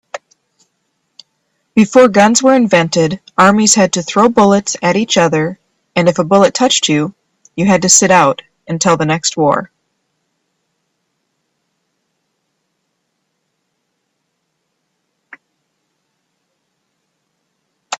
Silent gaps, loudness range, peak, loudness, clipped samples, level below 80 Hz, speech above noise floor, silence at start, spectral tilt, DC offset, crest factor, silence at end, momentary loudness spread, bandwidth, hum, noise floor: none; 8 LU; 0 dBFS; -11 LUFS; under 0.1%; -54 dBFS; 58 dB; 0.15 s; -3.5 dB/octave; under 0.1%; 14 dB; 0.05 s; 11 LU; 15.5 kHz; none; -69 dBFS